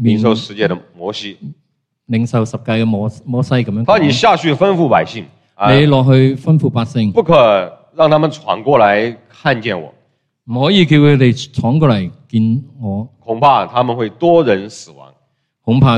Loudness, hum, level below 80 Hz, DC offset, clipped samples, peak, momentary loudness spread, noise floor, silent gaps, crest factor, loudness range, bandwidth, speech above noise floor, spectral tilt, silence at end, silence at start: -13 LUFS; none; -46 dBFS; under 0.1%; under 0.1%; 0 dBFS; 14 LU; -64 dBFS; none; 14 dB; 4 LU; 9.2 kHz; 51 dB; -7 dB/octave; 0 s; 0 s